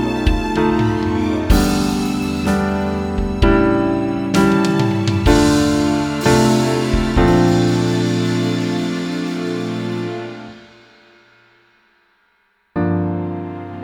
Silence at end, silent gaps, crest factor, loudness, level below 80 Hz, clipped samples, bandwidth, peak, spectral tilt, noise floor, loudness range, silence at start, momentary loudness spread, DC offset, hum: 0 s; none; 16 dB; -17 LUFS; -28 dBFS; under 0.1%; 19.5 kHz; 0 dBFS; -6 dB/octave; -61 dBFS; 12 LU; 0 s; 10 LU; under 0.1%; none